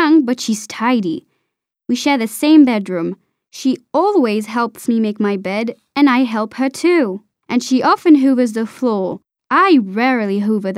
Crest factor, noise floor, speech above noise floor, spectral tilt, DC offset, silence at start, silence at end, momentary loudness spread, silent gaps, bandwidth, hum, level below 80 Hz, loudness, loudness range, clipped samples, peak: 14 dB; -75 dBFS; 60 dB; -5 dB/octave; under 0.1%; 0 s; 0 s; 11 LU; none; 15 kHz; none; -70 dBFS; -16 LUFS; 2 LU; under 0.1%; 0 dBFS